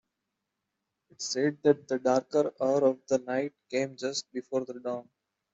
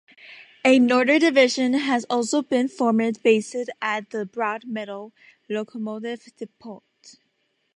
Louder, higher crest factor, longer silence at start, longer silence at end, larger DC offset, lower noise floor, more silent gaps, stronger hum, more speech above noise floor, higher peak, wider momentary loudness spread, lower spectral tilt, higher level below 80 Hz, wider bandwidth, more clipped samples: second, -30 LUFS vs -22 LUFS; about the same, 20 dB vs 18 dB; first, 1.2 s vs 0.25 s; second, 0.5 s vs 0.65 s; neither; first, -85 dBFS vs -71 dBFS; neither; neither; first, 56 dB vs 49 dB; second, -10 dBFS vs -4 dBFS; second, 10 LU vs 18 LU; about the same, -4.5 dB/octave vs -4 dB/octave; about the same, -76 dBFS vs -78 dBFS; second, 8 kHz vs 11 kHz; neither